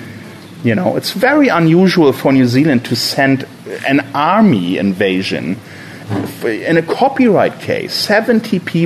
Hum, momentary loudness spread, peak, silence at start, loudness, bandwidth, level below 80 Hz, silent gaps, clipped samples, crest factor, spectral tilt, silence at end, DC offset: none; 12 LU; -2 dBFS; 0 s; -13 LUFS; 14 kHz; -56 dBFS; none; under 0.1%; 12 dB; -6 dB/octave; 0 s; under 0.1%